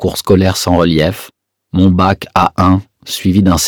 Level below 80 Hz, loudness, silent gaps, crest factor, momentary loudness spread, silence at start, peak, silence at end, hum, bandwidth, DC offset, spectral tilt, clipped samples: -34 dBFS; -12 LUFS; none; 12 dB; 7 LU; 0 s; 0 dBFS; 0 s; none; over 20 kHz; under 0.1%; -5.5 dB/octave; 0.4%